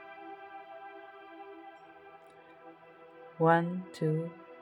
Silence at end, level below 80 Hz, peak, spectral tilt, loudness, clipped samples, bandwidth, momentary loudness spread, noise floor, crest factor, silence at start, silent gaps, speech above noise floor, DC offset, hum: 0 s; -86 dBFS; -12 dBFS; -8 dB/octave; -31 LUFS; under 0.1%; 11 kHz; 27 LU; -55 dBFS; 24 dB; 0 s; none; 26 dB; under 0.1%; none